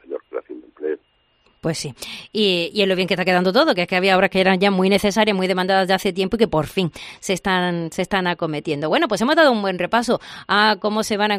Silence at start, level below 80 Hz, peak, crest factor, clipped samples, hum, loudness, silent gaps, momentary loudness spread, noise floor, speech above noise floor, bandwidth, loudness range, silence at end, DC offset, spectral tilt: 0.1 s; -52 dBFS; -2 dBFS; 18 dB; under 0.1%; none; -19 LUFS; none; 12 LU; -61 dBFS; 42 dB; 15 kHz; 4 LU; 0 s; under 0.1%; -4.5 dB/octave